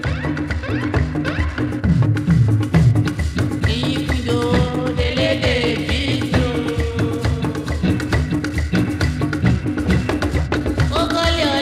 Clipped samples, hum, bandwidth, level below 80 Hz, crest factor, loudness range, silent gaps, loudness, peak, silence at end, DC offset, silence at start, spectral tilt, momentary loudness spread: under 0.1%; none; 14 kHz; -28 dBFS; 16 dB; 2 LU; none; -19 LUFS; -2 dBFS; 0 s; under 0.1%; 0 s; -6.5 dB/octave; 5 LU